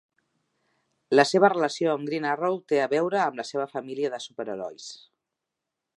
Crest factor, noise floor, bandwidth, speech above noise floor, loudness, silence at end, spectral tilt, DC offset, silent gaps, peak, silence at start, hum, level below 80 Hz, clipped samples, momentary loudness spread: 24 dB; -85 dBFS; 11.5 kHz; 60 dB; -25 LUFS; 1 s; -4.5 dB/octave; under 0.1%; none; -4 dBFS; 1.1 s; none; -82 dBFS; under 0.1%; 14 LU